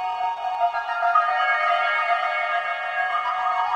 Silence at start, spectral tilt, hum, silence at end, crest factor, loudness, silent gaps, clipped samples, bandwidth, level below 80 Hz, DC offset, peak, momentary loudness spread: 0 s; -0.5 dB/octave; none; 0 s; 16 dB; -22 LUFS; none; under 0.1%; 8.8 kHz; -68 dBFS; under 0.1%; -8 dBFS; 5 LU